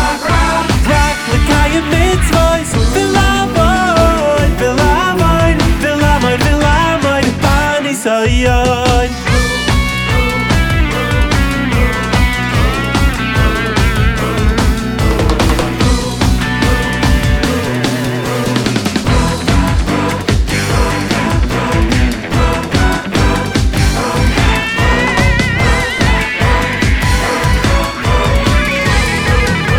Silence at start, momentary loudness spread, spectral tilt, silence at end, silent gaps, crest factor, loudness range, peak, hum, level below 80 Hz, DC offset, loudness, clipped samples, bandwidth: 0 s; 3 LU; -5 dB/octave; 0 s; none; 12 dB; 2 LU; 0 dBFS; none; -16 dBFS; under 0.1%; -12 LUFS; under 0.1%; 17.5 kHz